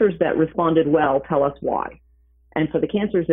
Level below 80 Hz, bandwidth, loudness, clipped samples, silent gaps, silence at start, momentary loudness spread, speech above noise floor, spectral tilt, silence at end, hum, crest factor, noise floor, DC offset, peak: -50 dBFS; 3.9 kHz; -21 LUFS; under 0.1%; none; 0 s; 8 LU; 37 dB; -11 dB/octave; 0 s; none; 14 dB; -56 dBFS; under 0.1%; -6 dBFS